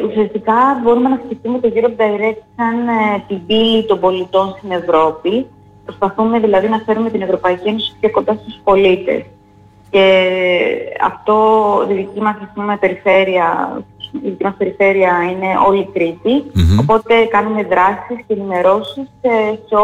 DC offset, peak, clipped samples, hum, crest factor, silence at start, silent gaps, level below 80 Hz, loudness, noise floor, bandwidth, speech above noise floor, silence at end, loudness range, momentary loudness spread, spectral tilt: under 0.1%; -2 dBFS; under 0.1%; none; 12 dB; 0 s; none; -38 dBFS; -14 LUFS; -45 dBFS; 8.6 kHz; 31 dB; 0 s; 2 LU; 9 LU; -7 dB/octave